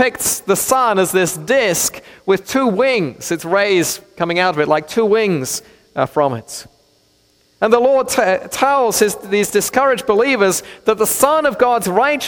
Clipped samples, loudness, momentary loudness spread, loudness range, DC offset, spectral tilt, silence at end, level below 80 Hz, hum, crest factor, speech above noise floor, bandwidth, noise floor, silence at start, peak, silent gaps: under 0.1%; -15 LUFS; 7 LU; 3 LU; under 0.1%; -3.5 dB/octave; 0 s; -52 dBFS; none; 16 dB; 41 dB; 17.5 kHz; -56 dBFS; 0 s; 0 dBFS; none